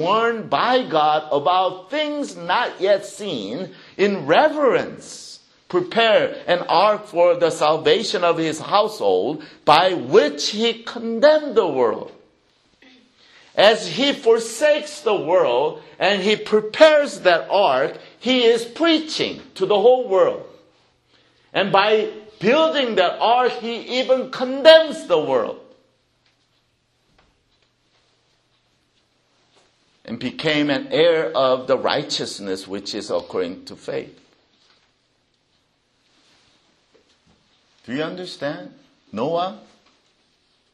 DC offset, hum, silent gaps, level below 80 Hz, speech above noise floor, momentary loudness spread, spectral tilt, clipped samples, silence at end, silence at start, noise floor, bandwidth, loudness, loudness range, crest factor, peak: under 0.1%; none; none; -66 dBFS; 47 dB; 13 LU; -4 dB/octave; under 0.1%; 1.15 s; 0 s; -65 dBFS; 12.5 kHz; -19 LUFS; 12 LU; 20 dB; 0 dBFS